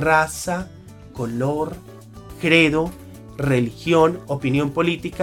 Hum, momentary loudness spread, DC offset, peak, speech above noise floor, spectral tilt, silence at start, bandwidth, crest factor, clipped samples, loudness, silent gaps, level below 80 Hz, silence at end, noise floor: none; 22 LU; under 0.1%; 0 dBFS; 19 dB; -5.5 dB/octave; 0 s; 17 kHz; 20 dB; under 0.1%; -20 LUFS; none; -46 dBFS; 0 s; -39 dBFS